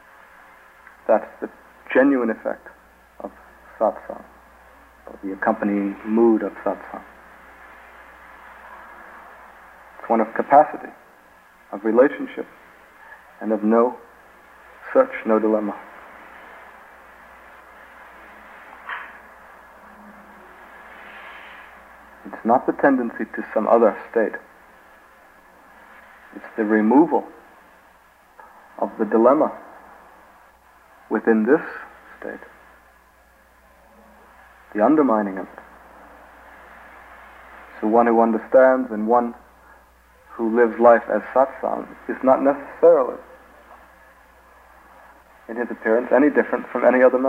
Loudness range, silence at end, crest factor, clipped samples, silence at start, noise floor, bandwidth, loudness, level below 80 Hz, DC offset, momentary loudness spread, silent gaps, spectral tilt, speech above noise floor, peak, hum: 19 LU; 0 s; 20 dB; under 0.1%; 1.1 s; -54 dBFS; 15 kHz; -19 LUFS; -60 dBFS; under 0.1%; 26 LU; none; -8.5 dB/octave; 35 dB; -2 dBFS; none